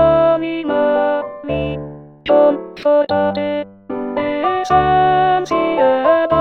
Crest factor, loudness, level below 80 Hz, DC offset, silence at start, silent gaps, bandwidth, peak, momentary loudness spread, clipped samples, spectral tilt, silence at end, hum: 14 dB; -16 LUFS; -42 dBFS; 0.1%; 0 s; none; 7.4 kHz; 0 dBFS; 11 LU; under 0.1%; -7 dB/octave; 0 s; none